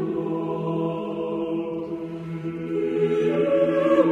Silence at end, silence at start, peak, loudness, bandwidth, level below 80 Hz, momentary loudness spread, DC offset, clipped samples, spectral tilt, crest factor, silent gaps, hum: 0 s; 0 s; -6 dBFS; -25 LUFS; 7.8 kHz; -60 dBFS; 11 LU; under 0.1%; under 0.1%; -8.5 dB/octave; 16 dB; none; none